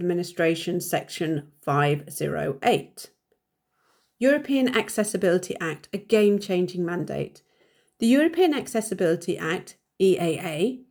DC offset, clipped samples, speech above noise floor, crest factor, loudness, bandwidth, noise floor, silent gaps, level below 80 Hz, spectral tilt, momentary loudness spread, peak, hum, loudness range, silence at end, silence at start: under 0.1%; under 0.1%; 51 dB; 18 dB; -24 LUFS; over 20 kHz; -75 dBFS; none; -66 dBFS; -5.5 dB/octave; 10 LU; -6 dBFS; none; 3 LU; 0.1 s; 0 s